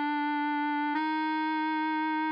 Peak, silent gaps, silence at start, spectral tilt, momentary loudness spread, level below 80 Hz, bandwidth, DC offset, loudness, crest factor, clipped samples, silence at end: -20 dBFS; none; 0 s; -4 dB/octave; 0 LU; under -90 dBFS; 5.2 kHz; under 0.1%; -30 LUFS; 10 dB; under 0.1%; 0 s